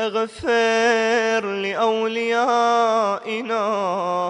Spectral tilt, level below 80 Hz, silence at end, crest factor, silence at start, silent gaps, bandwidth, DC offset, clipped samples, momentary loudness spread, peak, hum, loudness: -3.5 dB/octave; -60 dBFS; 0 s; 12 dB; 0 s; none; 10.5 kHz; under 0.1%; under 0.1%; 6 LU; -8 dBFS; none; -20 LUFS